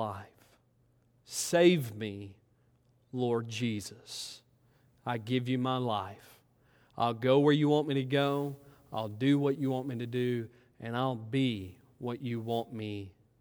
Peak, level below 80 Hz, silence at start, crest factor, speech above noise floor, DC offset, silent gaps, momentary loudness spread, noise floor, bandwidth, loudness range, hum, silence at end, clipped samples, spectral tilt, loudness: -12 dBFS; -74 dBFS; 0 s; 20 dB; 38 dB; under 0.1%; none; 18 LU; -69 dBFS; over 20 kHz; 7 LU; none; 0.3 s; under 0.1%; -6 dB/octave; -32 LUFS